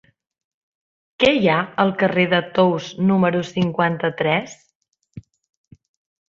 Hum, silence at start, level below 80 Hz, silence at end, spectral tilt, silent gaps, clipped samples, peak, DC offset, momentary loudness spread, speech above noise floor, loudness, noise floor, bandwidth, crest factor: none; 1.2 s; -58 dBFS; 1.1 s; -6.5 dB/octave; 4.75-4.81 s; under 0.1%; -2 dBFS; under 0.1%; 5 LU; 24 dB; -19 LUFS; -42 dBFS; 7.4 kHz; 20 dB